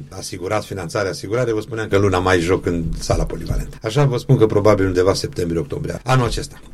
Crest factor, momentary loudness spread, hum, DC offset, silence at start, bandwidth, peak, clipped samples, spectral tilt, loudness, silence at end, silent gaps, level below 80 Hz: 18 dB; 10 LU; none; under 0.1%; 0 s; 14.5 kHz; 0 dBFS; under 0.1%; -6 dB/octave; -19 LUFS; 0 s; none; -32 dBFS